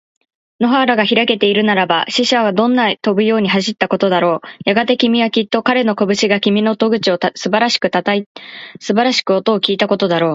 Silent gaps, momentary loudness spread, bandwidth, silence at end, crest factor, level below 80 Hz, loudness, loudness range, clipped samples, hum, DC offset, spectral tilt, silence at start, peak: 8.26-8.35 s; 5 LU; 8 kHz; 0 s; 14 dB; -60 dBFS; -14 LUFS; 2 LU; under 0.1%; none; under 0.1%; -4.5 dB/octave; 0.6 s; 0 dBFS